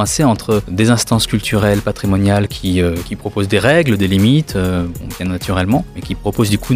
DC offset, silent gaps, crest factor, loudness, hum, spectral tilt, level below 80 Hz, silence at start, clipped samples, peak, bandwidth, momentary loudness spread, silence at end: under 0.1%; none; 14 dB; -15 LUFS; none; -5.5 dB/octave; -34 dBFS; 0 s; under 0.1%; 0 dBFS; 16 kHz; 10 LU; 0 s